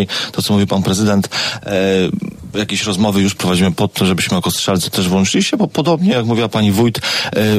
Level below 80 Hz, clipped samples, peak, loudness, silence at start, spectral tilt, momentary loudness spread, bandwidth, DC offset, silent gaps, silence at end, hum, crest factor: -46 dBFS; under 0.1%; -2 dBFS; -15 LUFS; 0 s; -4.5 dB/octave; 4 LU; 15.5 kHz; under 0.1%; none; 0 s; none; 12 dB